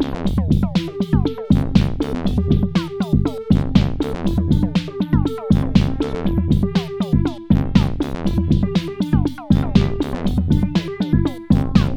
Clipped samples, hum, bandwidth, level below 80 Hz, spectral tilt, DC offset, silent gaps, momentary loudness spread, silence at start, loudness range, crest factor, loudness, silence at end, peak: under 0.1%; none; 10.5 kHz; -26 dBFS; -8 dB/octave; under 0.1%; none; 5 LU; 0 s; 1 LU; 16 dB; -19 LUFS; 0 s; 0 dBFS